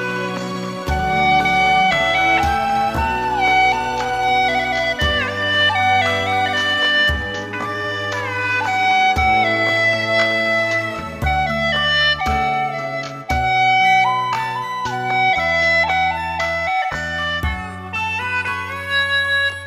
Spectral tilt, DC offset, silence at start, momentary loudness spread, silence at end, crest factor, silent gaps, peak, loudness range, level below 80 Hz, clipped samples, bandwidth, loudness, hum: -4 dB/octave; under 0.1%; 0 s; 9 LU; 0 s; 12 dB; none; -6 dBFS; 2 LU; -34 dBFS; under 0.1%; 15.5 kHz; -17 LUFS; none